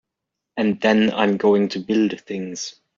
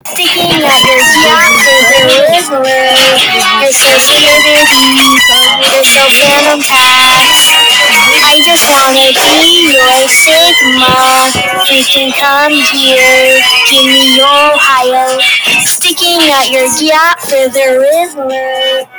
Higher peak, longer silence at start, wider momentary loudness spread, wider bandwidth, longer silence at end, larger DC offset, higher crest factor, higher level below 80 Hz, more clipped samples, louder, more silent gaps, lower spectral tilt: second, -4 dBFS vs 0 dBFS; first, 0.55 s vs 0.05 s; first, 12 LU vs 5 LU; second, 7.6 kHz vs over 20 kHz; first, 0.25 s vs 0 s; neither; first, 16 dB vs 6 dB; second, -64 dBFS vs -44 dBFS; second, under 0.1% vs 2%; second, -20 LUFS vs -4 LUFS; neither; first, -4.5 dB/octave vs -0.5 dB/octave